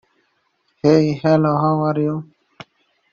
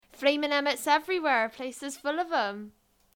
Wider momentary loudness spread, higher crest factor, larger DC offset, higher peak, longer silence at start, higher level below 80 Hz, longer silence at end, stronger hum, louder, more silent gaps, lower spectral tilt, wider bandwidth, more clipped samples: second, 7 LU vs 10 LU; about the same, 18 dB vs 18 dB; neither; first, -2 dBFS vs -10 dBFS; first, 0.85 s vs 0.2 s; first, -56 dBFS vs -72 dBFS; first, 0.9 s vs 0.45 s; neither; first, -17 LUFS vs -28 LUFS; neither; first, -7.5 dB/octave vs -2 dB/octave; second, 7 kHz vs 19 kHz; neither